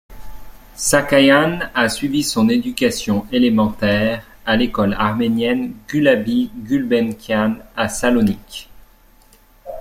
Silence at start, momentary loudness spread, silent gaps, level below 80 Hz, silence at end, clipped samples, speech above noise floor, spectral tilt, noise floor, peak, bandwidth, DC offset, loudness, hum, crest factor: 0.1 s; 8 LU; none; -42 dBFS; 0 s; under 0.1%; 33 dB; -4.5 dB/octave; -50 dBFS; -2 dBFS; 16 kHz; under 0.1%; -17 LUFS; none; 16 dB